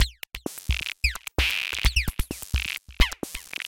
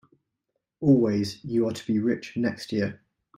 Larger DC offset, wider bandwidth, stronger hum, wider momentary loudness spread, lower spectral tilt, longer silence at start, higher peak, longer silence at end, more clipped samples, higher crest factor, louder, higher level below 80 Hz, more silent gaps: neither; first, 17 kHz vs 14 kHz; neither; about the same, 10 LU vs 8 LU; second, -3 dB/octave vs -7 dB/octave; second, 0 s vs 0.8 s; first, -4 dBFS vs -8 dBFS; second, 0 s vs 0.4 s; neither; about the same, 22 dB vs 18 dB; about the same, -27 LUFS vs -26 LUFS; first, -30 dBFS vs -64 dBFS; neither